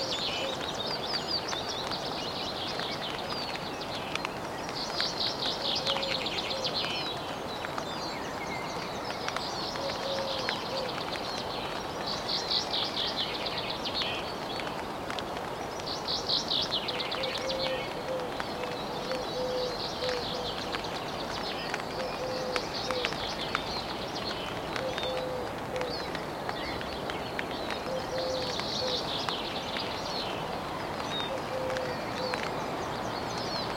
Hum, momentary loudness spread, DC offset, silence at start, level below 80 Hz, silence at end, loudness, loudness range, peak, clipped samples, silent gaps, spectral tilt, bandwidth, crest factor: none; 6 LU; under 0.1%; 0 s; -56 dBFS; 0 s; -32 LUFS; 3 LU; -10 dBFS; under 0.1%; none; -3.5 dB/octave; 16.5 kHz; 24 dB